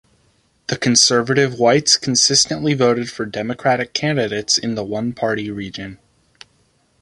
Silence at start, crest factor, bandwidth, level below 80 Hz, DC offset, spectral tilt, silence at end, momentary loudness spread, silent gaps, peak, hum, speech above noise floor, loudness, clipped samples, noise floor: 0.7 s; 18 dB; 11.5 kHz; -54 dBFS; under 0.1%; -3 dB/octave; 1.05 s; 14 LU; none; 0 dBFS; none; 42 dB; -16 LUFS; under 0.1%; -60 dBFS